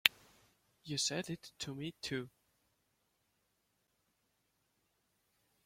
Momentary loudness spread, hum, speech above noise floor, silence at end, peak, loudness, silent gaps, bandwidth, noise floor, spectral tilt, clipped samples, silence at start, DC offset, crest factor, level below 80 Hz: 12 LU; none; 39 dB; 3.35 s; -2 dBFS; -39 LUFS; none; 16.5 kHz; -81 dBFS; -2.5 dB/octave; under 0.1%; 0.05 s; under 0.1%; 42 dB; -76 dBFS